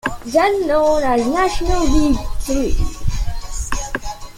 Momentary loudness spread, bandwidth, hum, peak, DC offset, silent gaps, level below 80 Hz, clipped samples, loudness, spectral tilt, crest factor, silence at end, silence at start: 11 LU; 16 kHz; none; -2 dBFS; under 0.1%; none; -24 dBFS; under 0.1%; -19 LUFS; -5 dB/octave; 14 dB; 0 s; 0.05 s